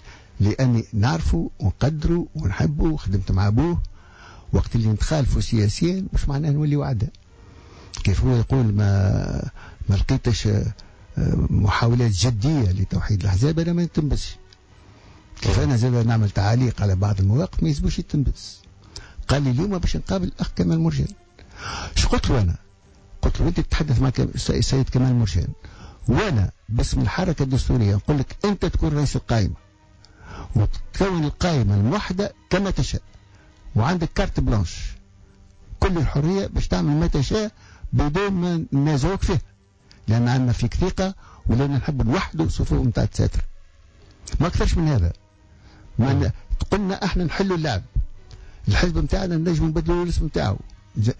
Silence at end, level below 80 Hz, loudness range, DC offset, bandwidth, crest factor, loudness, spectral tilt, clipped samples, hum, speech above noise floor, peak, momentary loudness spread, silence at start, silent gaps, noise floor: 0.05 s; -30 dBFS; 3 LU; under 0.1%; 8 kHz; 14 dB; -22 LUFS; -6.5 dB/octave; under 0.1%; none; 32 dB; -8 dBFS; 10 LU; 0.05 s; none; -52 dBFS